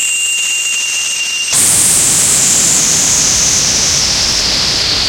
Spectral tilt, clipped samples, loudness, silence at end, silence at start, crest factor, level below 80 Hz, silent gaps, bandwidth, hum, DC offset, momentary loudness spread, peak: 0.5 dB/octave; under 0.1%; -8 LUFS; 0 s; 0 s; 12 dB; -36 dBFS; none; over 20 kHz; none; under 0.1%; 5 LU; 0 dBFS